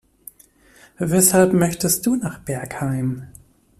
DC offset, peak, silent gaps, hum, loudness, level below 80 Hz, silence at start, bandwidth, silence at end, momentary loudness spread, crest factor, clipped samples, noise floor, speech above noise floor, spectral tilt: under 0.1%; -2 dBFS; none; none; -19 LUFS; -52 dBFS; 1 s; 15.5 kHz; 0.55 s; 14 LU; 20 dB; under 0.1%; -52 dBFS; 33 dB; -5 dB/octave